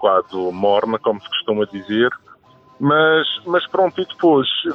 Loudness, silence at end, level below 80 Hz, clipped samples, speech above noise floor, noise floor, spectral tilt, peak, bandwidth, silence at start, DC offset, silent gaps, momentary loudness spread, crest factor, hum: -18 LUFS; 0 s; -62 dBFS; under 0.1%; 31 dB; -48 dBFS; -7.5 dB/octave; -2 dBFS; 6.2 kHz; 0 s; under 0.1%; none; 7 LU; 16 dB; none